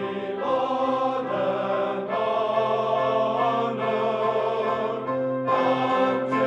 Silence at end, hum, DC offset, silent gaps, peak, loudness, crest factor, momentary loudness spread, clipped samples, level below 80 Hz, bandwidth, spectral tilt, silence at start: 0 s; none; under 0.1%; none; -10 dBFS; -24 LUFS; 14 dB; 4 LU; under 0.1%; -70 dBFS; 8.2 kHz; -6.5 dB/octave; 0 s